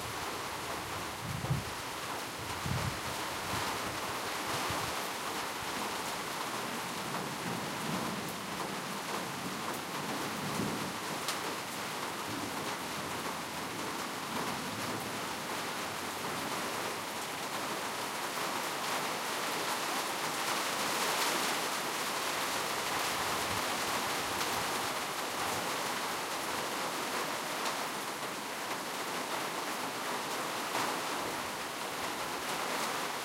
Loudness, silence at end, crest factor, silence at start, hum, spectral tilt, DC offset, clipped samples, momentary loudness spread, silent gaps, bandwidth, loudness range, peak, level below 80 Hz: -35 LUFS; 0 s; 18 dB; 0 s; none; -2.5 dB/octave; under 0.1%; under 0.1%; 5 LU; none; 16 kHz; 4 LU; -18 dBFS; -62 dBFS